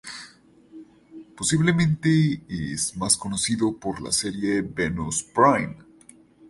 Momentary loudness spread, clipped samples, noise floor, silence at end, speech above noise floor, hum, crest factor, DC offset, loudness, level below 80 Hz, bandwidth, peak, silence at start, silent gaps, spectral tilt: 11 LU; under 0.1%; -52 dBFS; 0.65 s; 29 dB; none; 20 dB; under 0.1%; -23 LUFS; -50 dBFS; 11.5 kHz; -4 dBFS; 0.05 s; none; -4.5 dB/octave